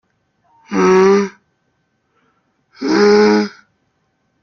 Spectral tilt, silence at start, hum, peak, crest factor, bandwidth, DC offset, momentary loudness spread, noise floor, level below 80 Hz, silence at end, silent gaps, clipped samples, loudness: -5.5 dB/octave; 0.7 s; none; 0 dBFS; 16 dB; 7 kHz; under 0.1%; 15 LU; -65 dBFS; -58 dBFS; 0.95 s; none; under 0.1%; -13 LUFS